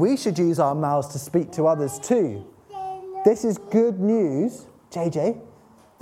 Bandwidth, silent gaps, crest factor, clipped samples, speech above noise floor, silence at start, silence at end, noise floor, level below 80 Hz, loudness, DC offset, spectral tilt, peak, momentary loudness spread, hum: 15.5 kHz; none; 20 dB; under 0.1%; 31 dB; 0 s; 0.55 s; -52 dBFS; -64 dBFS; -23 LUFS; under 0.1%; -7 dB/octave; -4 dBFS; 14 LU; none